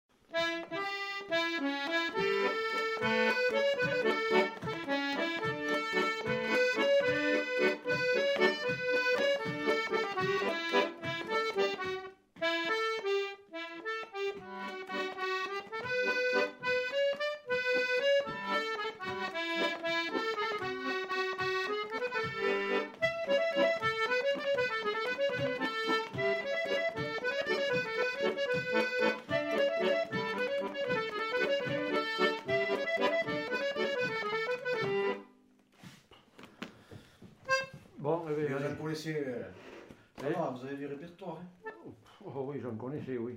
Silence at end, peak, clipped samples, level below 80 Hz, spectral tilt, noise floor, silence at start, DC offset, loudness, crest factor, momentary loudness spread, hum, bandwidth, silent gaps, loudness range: 0 s; -14 dBFS; under 0.1%; -74 dBFS; -4.5 dB/octave; -64 dBFS; 0.3 s; under 0.1%; -32 LUFS; 20 dB; 11 LU; none; 16 kHz; none; 7 LU